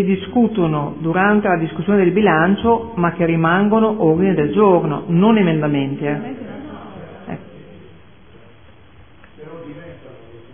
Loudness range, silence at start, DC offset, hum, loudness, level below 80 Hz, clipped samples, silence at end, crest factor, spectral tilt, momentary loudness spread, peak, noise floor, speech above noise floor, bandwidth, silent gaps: 21 LU; 0 s; 0.5%; none; -16 LUFS; -50 dBFS; under 0.1%; 0.15 s; 16 dB; -11.5 dB/octave; 21 LU; -2 dBFS; -46 dBFS; 31 dB; 3.6 kHz; none